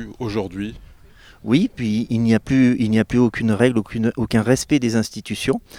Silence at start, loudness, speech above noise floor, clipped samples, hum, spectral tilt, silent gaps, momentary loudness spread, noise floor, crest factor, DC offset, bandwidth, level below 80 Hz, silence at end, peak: 0 s; -19 LUFS; 27 dB; under 0.1%; none; -6 dB/octave; none; 9 LU; -46 dBFS; 18 dB; under 0.1%; 15 kHz; -44 dBFS; 0 s; -2 dBFS